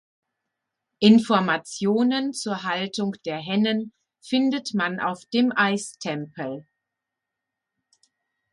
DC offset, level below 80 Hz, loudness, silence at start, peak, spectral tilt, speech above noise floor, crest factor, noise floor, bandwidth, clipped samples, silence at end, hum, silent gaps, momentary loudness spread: under 0.1%; -70 dBFS; -23 LUFS; 1 s; -4 dBFS; -5 dB/octave; 62 dB; 20 dB; -85 dBFS; 11.5 kHz; under 0.1%; 1.9 s; none; none; 13 LU